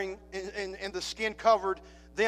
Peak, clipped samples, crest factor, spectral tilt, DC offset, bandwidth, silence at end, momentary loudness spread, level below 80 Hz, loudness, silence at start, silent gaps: -12 dBFS; under 0.1%; 20 dB; -3 dB/octave; under 0.1%; 15 kHz; 0 s; 14 LU; -56 dBFS; -31 LUFS; 0 s; none